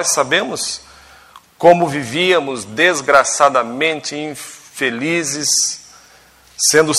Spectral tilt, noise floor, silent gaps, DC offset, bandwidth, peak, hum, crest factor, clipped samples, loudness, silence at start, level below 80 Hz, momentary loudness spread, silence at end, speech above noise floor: -2 dB/octave; -47 dBFS; none; under 0.1%; 15 kHz; 0 dBFS; none; 16 dB; 0.1%; -15 LUFS; 0 s; -58 dBFS; 13 LU; 0 s; 32 dB